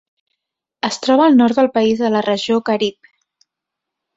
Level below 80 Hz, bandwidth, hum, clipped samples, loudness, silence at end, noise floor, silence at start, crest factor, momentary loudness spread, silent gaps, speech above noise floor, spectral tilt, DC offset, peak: -60 dBFS; 8 kHz; none; under 0.1%; -15 LUFS; 1.25 s; -82 dBFS; 0.85 s; 16 dB; 10 LU; none; 67 dB; -5 dB/octave; under 0.1%; -2 dBFS